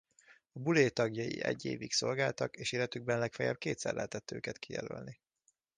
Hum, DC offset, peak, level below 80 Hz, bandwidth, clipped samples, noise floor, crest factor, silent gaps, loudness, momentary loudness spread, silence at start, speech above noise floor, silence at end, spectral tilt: none; under 0.1%; -14 dBFS; -70 dBFS; 10 kHz; under 0.1%; -77 dBFS; 22 dB; none; -35 LUFS; 12 LU; 0.3 s; 42 dB; 0.65 s; -4.5 dB/octave